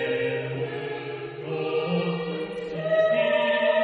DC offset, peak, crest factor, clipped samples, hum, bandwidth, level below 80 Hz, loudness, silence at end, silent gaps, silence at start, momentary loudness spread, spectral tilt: under 0.1%; -10 dBFS; 14 dB; under 0.1%; none; 6 kHz; -66 dBFS; -26 LUFS; 0 s; none; 0 s; 11 LU; -7.5 dB/octave